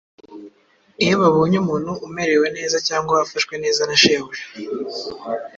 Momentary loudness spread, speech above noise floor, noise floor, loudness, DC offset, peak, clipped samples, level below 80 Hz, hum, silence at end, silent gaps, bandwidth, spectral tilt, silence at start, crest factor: 14 LU; 36 dB; -55 dBFS; -19 LUFS; under 0.1%; 0 dBFS; under 0.1%; -56 dBFS; none; 0.1 s; none; 7.8 kHz; -4 dB/octave; 0.3 s; 20 dB